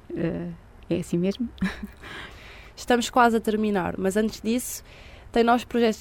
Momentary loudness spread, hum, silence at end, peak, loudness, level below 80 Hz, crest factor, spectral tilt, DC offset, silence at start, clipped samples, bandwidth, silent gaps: 18 LU; none; 0 s; -6 dBFS; -25 LUFS; -48 dBFS; 20 dB; -5 dB/octave; under 0.1%; 0.1 s; under 0.1%; 17 kHz; none